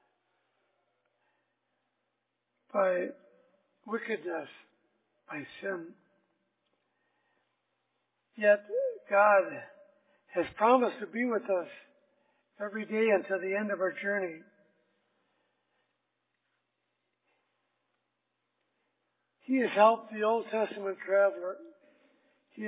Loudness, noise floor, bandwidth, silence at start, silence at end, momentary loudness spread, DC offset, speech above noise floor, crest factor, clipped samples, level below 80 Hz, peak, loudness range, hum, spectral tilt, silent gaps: -30 LUFS; -83 dBFS; 4 kHz; 2.75 s; 0 s; 17 LU; under 0.1%; 53 dB; 22 dB; under 0.1%; -82 dBFS; -10 dBFS; 13 LU; none; -3.5 dB/octave; none